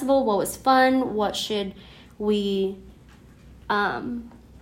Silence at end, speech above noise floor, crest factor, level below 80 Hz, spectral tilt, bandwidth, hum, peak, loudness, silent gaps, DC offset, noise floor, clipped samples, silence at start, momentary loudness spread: 0.25 s; 26 dB; 18 dB; -52 dBFS; -4.5 dB/octave; 16 kHz; none; -8 dBFS; -24 LUFS; none; under 0.1%; -49 dBFS; under 0.1%; 0 s; 14 LU